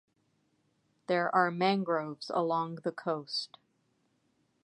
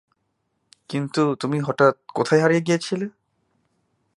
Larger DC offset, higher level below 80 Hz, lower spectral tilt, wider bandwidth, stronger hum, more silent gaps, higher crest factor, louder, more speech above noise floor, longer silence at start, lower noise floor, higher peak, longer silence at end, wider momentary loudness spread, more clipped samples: neither; second, -86 dBFS vs -70 dBFS; about the same, -6 dB/octave vs -6 dB/octave; about the same, 11.5 kHz vs 11.5 kHz; neither; neither; about the same, 22 dB vs 20 dB; second, -32 LUFS vs -21 LUFS; second, 43 dB vs 53 dB; first, 1.1 s vs 0.9 s; about the same, -75 dBFS vs -73 dBFS; second, -12 dBFS vs -2 dBFS; about the same, 1.15 s vs 1.05 s; about the same, 9 LU vs 11 LU; neither